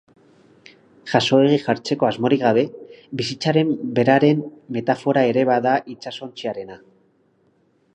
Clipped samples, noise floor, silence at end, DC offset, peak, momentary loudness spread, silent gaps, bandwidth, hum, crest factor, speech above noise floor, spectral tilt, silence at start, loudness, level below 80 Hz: under 0.1%; -61 dBFS; 1.2 s; under 0.1%; -2 dBFS; 16 LU; none; 9.4 kHz; none; 18 dB; 42 dB; -6 dB/octave; 1.05 s; -19 LUFS; -64 dBFS